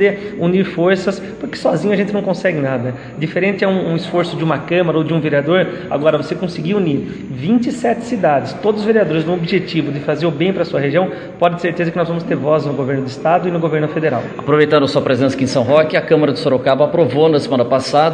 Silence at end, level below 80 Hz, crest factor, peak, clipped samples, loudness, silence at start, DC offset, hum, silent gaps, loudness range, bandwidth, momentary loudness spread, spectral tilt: 0 s; -52 dBFS; 16 dB; 0 dBFS; under 0.1%; -16 LUFS; 0 s; under 0.1%; none; none; 3 LU; 10 kHz; 6 LU; -7 dB/octave